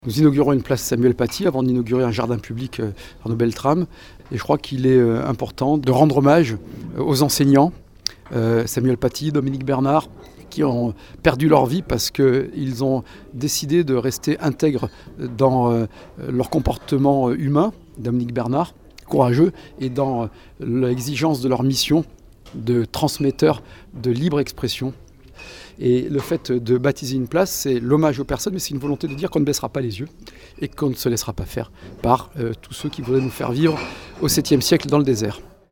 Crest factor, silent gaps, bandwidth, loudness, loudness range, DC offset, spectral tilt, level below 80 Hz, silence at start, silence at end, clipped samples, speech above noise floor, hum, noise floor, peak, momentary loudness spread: 20 dB; none; 19.5 kHz; -20 LUFS; 5 LU; 0.1%; -6 dB/octave; -44 dBFS; 0.05 s; 0.25 s; under 0.1%; 22 dB; none; -42 dBFS; 0 dBFS; 13 LU